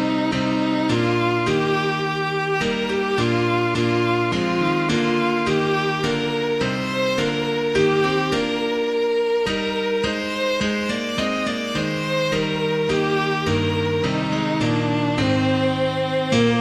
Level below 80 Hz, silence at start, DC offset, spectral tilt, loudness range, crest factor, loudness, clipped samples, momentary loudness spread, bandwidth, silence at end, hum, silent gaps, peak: -48 dBFS; 0 s; under 0.1%; -5.5 dB/octave; 2 LU; 14 dB; -21 LUFS; under 0.1%; 3 LU; 15 kHz; 0 s; none; none; -6 dBFS